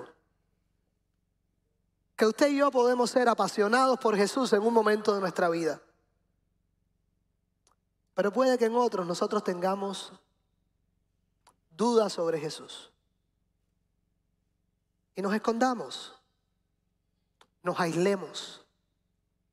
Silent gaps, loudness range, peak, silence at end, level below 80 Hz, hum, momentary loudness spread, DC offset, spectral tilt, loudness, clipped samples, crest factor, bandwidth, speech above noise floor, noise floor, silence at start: none; 9 LU; -12 dBFS; 0.95 s; -76 dBFS; none; 16 LU; under 0.1%; -4.5 dB/octave; -27 LUFS; under 0.1%; 20 dB; 14.5 kHz; 50 dB; -77 dBFS; 0 s